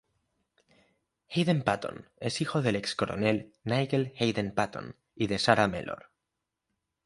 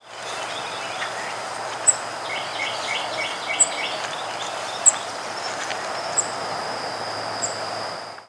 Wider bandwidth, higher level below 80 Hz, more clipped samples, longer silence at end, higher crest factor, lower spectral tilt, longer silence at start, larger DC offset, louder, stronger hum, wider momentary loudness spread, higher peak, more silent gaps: about the same, 11.5 kHz vs 11 kHz; first, -60 dBFS vs -70 dBFS; neither; first, 1.1 s vs 0 s; about the same, 26 dB vs 24 dB; first, -5.5 dB/octave vs 0 dB/octave; first, 1.3 s vs 0.05 s; neither; second, -29 LUFS vs -24 LUFS; neither; about the same, 12 LU vs 10 LU; about the same, -4 dBFS vs -2 dBFS; neither